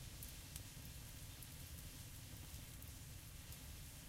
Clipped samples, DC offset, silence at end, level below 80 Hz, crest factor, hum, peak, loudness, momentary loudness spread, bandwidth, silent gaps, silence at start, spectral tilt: under 0.1%; under 0.1%; 0 s; -60 dBFS; 24 dB; none; -30 dBFS; -54 LUFS; 2 LU; 16.5 kHz; none; 0 s; -3 dB/octave